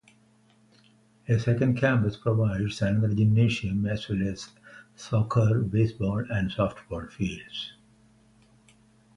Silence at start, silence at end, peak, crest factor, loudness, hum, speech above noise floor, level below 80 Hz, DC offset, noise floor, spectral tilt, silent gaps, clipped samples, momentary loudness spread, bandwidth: 1.3 s; 1.45 s; -10 dBFS; 16 dB; -26 LUFS; none; 36 dB; -50 dBFS; under 0.1%; -61 dBFS; -7.5 dB/octave; none; under 0.1%; 14 LU; 10 kHz